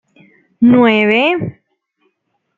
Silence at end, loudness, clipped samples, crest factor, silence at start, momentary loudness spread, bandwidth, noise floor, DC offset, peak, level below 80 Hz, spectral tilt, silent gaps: 1.05 s; -11 LUFS; under 0.1%; 14 dB; 0.6 s; 11 LU; 4.5 kHz; -67 dBFS; under 0.1%; -2 dBFS; -56 dBFS; -7.5 dB/octave; none